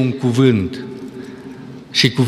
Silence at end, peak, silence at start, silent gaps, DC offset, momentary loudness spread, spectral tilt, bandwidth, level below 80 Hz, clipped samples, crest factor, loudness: 0 s; -2 dBFS; 0 s; none; under 0.1%; 20 LU; -5.5 dB/octave; 14.5 kHz; -54 dBFS; under 0.1%; 16 dB; -16 LUFS